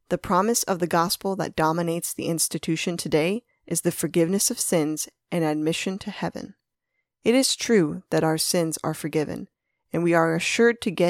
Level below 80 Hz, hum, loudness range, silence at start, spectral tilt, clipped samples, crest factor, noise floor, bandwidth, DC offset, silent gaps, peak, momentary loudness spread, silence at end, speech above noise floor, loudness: -60 dBFS; none; 2 LU; 0.1 s; -4 dB/octave; under 0.1%; 18 dB; -79 dBFS; 18.5 kHz; under 0.1%; none; -6 dBFS; 10 LU; 0 s; 55 dB; -24 LUFS